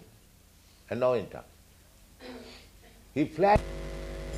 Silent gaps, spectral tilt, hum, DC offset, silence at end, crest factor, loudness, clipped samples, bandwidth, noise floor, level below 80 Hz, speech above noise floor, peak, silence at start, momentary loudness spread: none; -6.5 dB/octave; none; under 0.1%; 0 s; 20 dB; -29 LUFS; under 0.1%; 15.5 kHz; -58 dBFS; -46 dBFS; 31 dB; -12 dBFS; 0 s; 24 LU